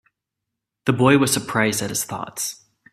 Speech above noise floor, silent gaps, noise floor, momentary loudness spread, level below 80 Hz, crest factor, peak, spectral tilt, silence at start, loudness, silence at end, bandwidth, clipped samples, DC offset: 63 dB; none; -83 dBFS; 12 LU; -58 dBFS; 22 dB; 0 dBFS; -4 dB/octave; 0.85 s; -20 LUFS; 0.4 s; 16 kHz; under 0.1%; under 0.1%